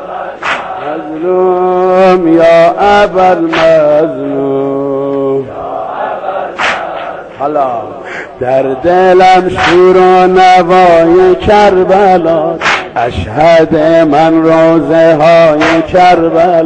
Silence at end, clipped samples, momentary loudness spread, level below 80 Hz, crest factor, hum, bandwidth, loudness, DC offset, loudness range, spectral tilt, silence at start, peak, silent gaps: 0 s; 0.4%; 12 LU; -36 dBFS; 8 dB; none; 9 kHz; -7 LUFS; under 0.1%; 9 LU; -6 dB/octave; 0 s; 0 dBFS; none